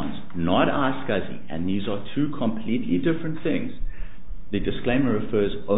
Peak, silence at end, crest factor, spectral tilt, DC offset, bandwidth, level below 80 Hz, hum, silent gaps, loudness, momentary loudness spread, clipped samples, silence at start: -6 dBFS; 0 s; 18 dB; -11 dB/octave; 5%; 4 kHz; -40 dBFS; none; none; -25 LUFS; 13 LU; under 0.1%; 0 s